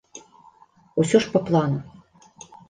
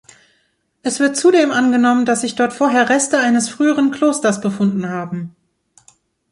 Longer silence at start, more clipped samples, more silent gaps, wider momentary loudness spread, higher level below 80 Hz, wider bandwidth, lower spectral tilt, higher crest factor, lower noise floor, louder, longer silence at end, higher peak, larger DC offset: second, 0.15 s vs 0.85 s; neither; neither; first, 21 LU vs 11 LU; about the same, -60 dBFS vs -62 dBFS; second, 9.8 kHz vs 11.5 kHz; first, -6 dB/octave vs -4 dB/octave; first, 20 dB vs 14 dB; second, -54 dBFS vs -64 dBFS; second, -22 LUFS vs -16 LUFS; second, 0.8 s vs 1.05 s; about the same, -4 dBFS vs -2 dBFS; neither